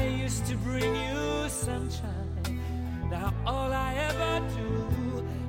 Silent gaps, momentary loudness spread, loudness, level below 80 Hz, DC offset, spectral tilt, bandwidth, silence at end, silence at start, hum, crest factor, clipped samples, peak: none; 5 LU; -31 LUFS; -38 dBFS; under 0.1%; -5.5 dB/octave; 16.5 kHz; 0 s; 0 s; none; 16 dB; under 0.1%; -14 dBFS